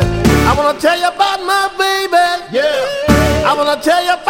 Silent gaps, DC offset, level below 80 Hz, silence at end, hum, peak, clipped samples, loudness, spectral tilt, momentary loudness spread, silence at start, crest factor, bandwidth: none; under 0.1%; -26 dBFS; 0 s; none; 0 dBFS; under 0.1%; -13 LUFS; -4.5 dB/octave; 4 LU; 0 s; 12 dB; 17 kHz